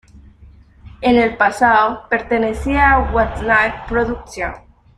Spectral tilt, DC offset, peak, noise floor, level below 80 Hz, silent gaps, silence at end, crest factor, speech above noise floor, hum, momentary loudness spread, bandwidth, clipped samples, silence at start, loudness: -6 dB/octave; under 0.1%; -2 dBFS; -44 dBFS; -30 dBFS; none; 0.4 s; 16 dB; 29 dB; none; 10 LU; 13 kHz; under 0.1%; 0.15 s; -16 LUFS